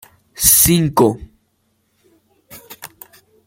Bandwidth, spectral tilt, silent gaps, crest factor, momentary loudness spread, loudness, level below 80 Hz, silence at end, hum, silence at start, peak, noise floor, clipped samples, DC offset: 17 kHz; -3.5 dB/octave; none; 18 dB; 26 LU; -12 LUFS; -40 dBFS; 0.6 s; none; 0.4 s; 0 dBFS; -64 dBFS; under 0.1%; under 0.1%